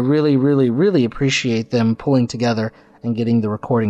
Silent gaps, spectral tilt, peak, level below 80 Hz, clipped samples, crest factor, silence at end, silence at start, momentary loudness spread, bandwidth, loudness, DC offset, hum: none; -6.5 dB/octave; -6 dBFS; -50 dBFS; under 0.1%; 10 dB; 0 s; 0 s; 8 LU; 8.2 kHz; -18 LUFS; under 0.1%; none